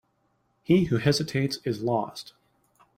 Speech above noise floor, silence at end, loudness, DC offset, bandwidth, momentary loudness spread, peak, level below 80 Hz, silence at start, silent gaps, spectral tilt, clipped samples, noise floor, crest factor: 46 dB; 0.75 s; -25 LUFS; under 0.1%; 16 kHz; 20 LU; -8 dBFS; -58 dBFS; 0.7 s; none; -6 dB/octave; under 0.1%; -71 dBFS; 20 dB